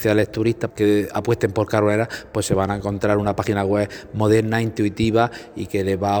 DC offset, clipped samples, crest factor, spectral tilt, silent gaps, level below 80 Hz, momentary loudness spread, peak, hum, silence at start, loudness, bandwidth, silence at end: under 0.1%; under 0.1%; 18 dB; -6.5 dB/octave; none; -46 dBFS; 5 LU; -2 dBFS; none; 0 s; -21 LUFS; over 20 kHz; 0 s